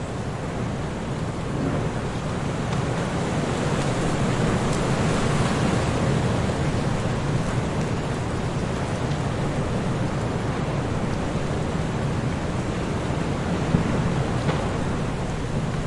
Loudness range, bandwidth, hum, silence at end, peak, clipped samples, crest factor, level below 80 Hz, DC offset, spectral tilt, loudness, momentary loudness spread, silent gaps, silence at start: 3 LU; 11.5 kHz; none; 0 s; -6 dBFS; under 0.1%; 18 dB; -36 dBFS; under 0.1%; -6 dB/octave; -25 LUFS; 5 LU; none; 0 s